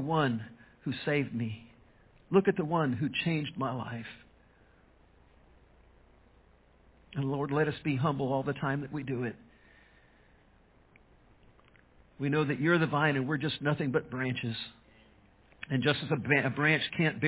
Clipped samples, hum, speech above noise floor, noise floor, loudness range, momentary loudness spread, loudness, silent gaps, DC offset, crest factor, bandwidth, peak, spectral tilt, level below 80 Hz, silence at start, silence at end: under 0.1%; none; 32 dB; -63 dBFS; 12 LU; 12 LU; -31 LUFS; none; under 0.1%; 22 dB; 4 kHz; -10 dBFS; -5 dB/octave; -64 dBFS; 0 s; 0 s